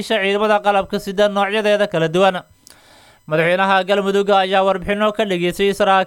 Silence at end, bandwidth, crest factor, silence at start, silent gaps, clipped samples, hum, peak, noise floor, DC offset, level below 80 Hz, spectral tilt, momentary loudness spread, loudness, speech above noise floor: 0 s; 17 kHz; 16 dB; 0 s; none; under 0.1%; none; -2 dBFS; -48 dBFS; under 0.1%; -48 dBFS; -5 dB/octave; 4 LU; -16 LUFS; 32 dB